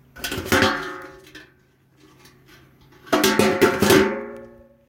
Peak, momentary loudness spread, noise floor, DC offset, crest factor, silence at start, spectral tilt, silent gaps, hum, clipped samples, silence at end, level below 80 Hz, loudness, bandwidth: -2 dBFS; 21 LU; -58 dBFS; under 0.1%; 22 dB; 0.15 s; -4 dB/octave; none; none; under 0.1%; 0.4 s; -50 dBFS; -19 LUFS; 17 kHz